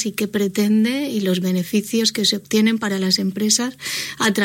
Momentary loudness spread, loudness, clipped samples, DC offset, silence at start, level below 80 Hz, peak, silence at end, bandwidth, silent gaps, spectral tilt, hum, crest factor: 4 LU; -19 LUFS; under 0.1%; under 0.1%; 0 s; -62 dBFS; -4 dBFS; 0 s; 16.5 kHz; none; -3.5 dB/octave; none; 16 dB